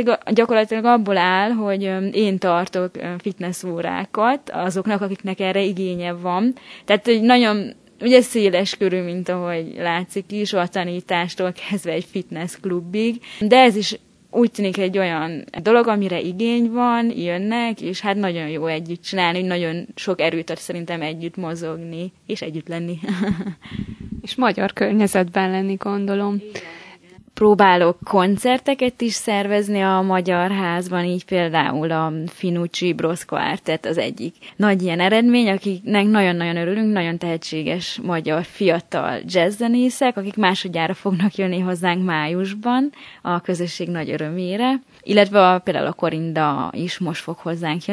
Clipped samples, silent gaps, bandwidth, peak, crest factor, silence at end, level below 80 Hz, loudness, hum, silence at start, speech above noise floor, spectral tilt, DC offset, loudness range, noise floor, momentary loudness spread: under 0.1%; none; 11 kHz; 0 dBFS; 20 dB; 0 s; -58 dBFS; -20 LUFS; none; 0 s; 27 dB; -5.5 dB/octave; under 0.1%; 6 LU; -46 dBFS; 12 LU